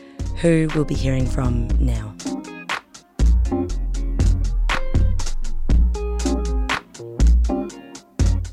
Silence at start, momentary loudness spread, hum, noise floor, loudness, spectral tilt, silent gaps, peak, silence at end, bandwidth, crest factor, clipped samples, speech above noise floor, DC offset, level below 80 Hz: 0 s; 11 LU; none; -40 dBFS; -22 LUFS; -6 dB/octave; none; -4 dBFS; 0 s; 10.5 kHz; 14 dB; under 0.1%; 21 dB; under 0.1%; -20 dBFS